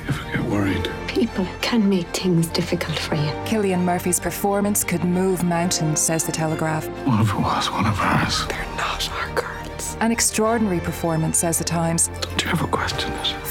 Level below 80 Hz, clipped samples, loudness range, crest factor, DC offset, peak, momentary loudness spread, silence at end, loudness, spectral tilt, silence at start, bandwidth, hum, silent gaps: -40 dBFS; under 0.1%; 1 LU; 18 dB; under 0.1%; -4 dBFS; 6 LU; 0 s; -21 LUFS; -4 dB/octave; 0 s; 18 kHz; none; none